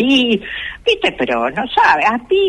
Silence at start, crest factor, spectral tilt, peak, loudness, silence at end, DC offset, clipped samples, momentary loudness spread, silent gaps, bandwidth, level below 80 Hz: 0 s; 12 dB; -4 dB/octave; -2 dBFS; -15 LUFS; 0 s; under 0.1%; under 0.1%; 7 LU; none; 10.5 kHz; -44 dBFS